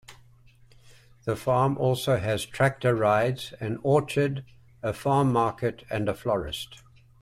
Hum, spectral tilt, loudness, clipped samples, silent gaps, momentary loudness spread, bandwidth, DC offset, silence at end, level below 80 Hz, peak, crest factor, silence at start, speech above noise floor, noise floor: none; -6 dB/octave; -26 LUFS; under 0.1%; none; 11 LU; 15.5 kHz; under 0.1%; 0.45 s; -54 dBFS; -10 dBFS; 16 dB; 0.1 s; 30 dB; -55 dBFS